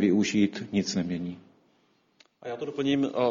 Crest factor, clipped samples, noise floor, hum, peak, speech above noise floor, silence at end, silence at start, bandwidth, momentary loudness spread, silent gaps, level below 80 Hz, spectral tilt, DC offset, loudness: 16 dB; under 0.1%; -67 dBFS; none; -12 dBFS; 41 dB; 0 s; 0 s; 7.6 kHz; 15 LU; none; -64 dBFS; -5.5 dB/octave; under 0.1%; -28 LUFS